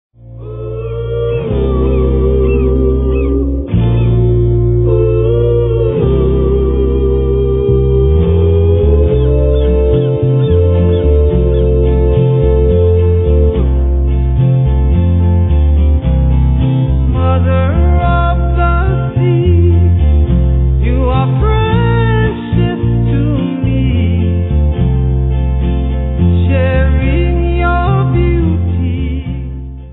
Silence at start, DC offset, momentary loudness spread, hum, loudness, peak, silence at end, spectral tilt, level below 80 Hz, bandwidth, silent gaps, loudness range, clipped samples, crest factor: 0.25 s; under 0.1%; 4 LU; none; -12 LUFS; 0 dBFS; 0 s; -12.5 dB/octave; -14 dBFS; 4 kHz; none; 2 LU; under 0.1%; 10 dB